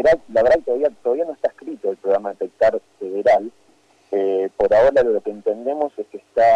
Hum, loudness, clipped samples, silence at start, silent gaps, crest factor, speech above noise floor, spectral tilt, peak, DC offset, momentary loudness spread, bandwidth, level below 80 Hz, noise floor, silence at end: none; -20 LUFS; under 0.1%; 0 s; none; 10 dB; 38 dB; -6 dB/octave; -8 dBFS; under 0.1%; 11 LU; 9 kHz; -50 dBFS; -56 dBFS; 0 s